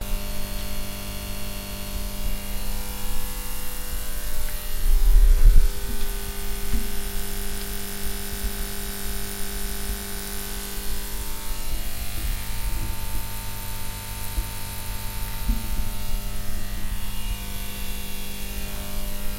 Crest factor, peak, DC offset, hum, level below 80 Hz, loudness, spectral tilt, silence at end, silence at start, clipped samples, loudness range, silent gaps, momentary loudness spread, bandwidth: 20 dB; -2 dBFS; under 0.1%; none; -24 dBFS; -30 LUFS; -3.5 dB/octave; 0 s; 0 s; under 0.1%; 6 LU; none; 4 LU; 16.5 kHz